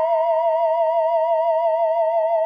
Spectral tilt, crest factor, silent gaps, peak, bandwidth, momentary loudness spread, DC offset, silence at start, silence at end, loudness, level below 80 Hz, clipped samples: 0 dB/octave; 8 dB; none; -10 dBFS; 5 kHz; 0 LU; under 0.1%; 0 s; 0 s; -19 LUFS; under -90 dBFS; under 0.1%